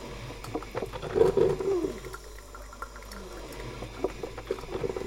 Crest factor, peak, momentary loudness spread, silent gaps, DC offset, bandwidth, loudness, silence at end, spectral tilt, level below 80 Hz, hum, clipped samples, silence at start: 24 dB; -8 dBFS; 18 LU; none; under 0.1%; 16.5 kHz; -31 LUFS; 0 s; -6 dB/octave; -46 dBFS; none; under 0.1%; 0 s